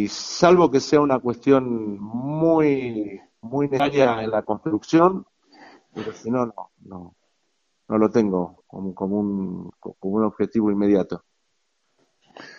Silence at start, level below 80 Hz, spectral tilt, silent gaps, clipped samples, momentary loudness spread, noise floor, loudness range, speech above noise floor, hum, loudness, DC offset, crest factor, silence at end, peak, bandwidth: 0 s; -58 dBFS; -6.5 dB/octave; none; under 0.1%; 17 LU; -73 dBFS; 6 LU; 52 dB; none; -21 LUFS; under 0.1%; 22 dB; 0.05 s; 0 dBFS; 7.6 kHz